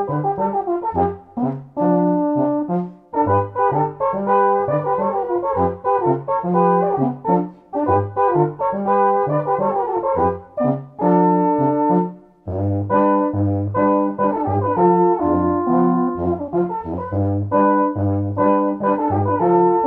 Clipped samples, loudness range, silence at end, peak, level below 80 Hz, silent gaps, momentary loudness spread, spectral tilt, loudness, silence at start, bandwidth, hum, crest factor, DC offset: under 0.1%; 2 LU; 0 s; -4 dBFS; -50 dBFS; none; 6 LU; -12 dB/octave; -19 LUFS; 0 s; 3.7 kHz; none; 14 dB; under 0.1%